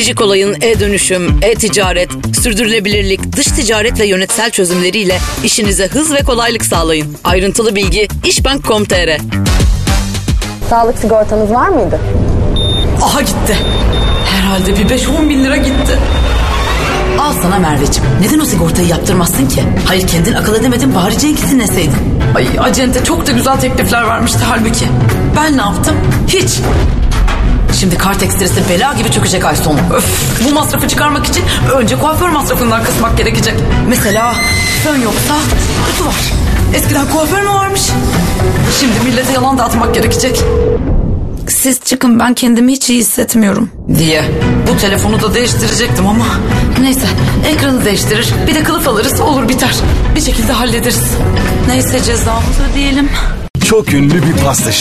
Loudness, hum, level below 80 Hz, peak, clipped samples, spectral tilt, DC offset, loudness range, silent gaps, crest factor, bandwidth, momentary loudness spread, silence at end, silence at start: -11 LUFS; none; -18 dBFS; 0 dBFS; under 0.1%; -4.5 dB/octave; under 0.1%; 1 LU; 53.50-53.54 s; 10 dB; 14 kHz; 3 LU; 0 s; 0 s